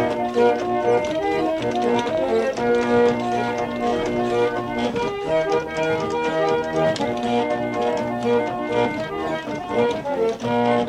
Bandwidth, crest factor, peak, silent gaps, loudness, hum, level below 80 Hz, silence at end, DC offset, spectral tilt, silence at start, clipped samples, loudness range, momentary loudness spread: 11.5 kHz; 16 dB; -6 dBFS; none; -22 LUFS; none; -50 dBFS; 0 s; under 0.1%; -5.5 dB/octave; 0 s; under 0.1%; 2 LU; 5 LU